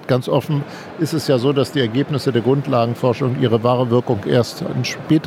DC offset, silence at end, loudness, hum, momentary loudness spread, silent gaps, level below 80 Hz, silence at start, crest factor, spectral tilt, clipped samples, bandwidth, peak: under 0.1%; 0 s; -18 LUFS; none; 6 LU; none; -58 dBFS; 0 s; 16 dB; -6.5 dB/octave; under 0.1%; 16 kHz; -2 dBFS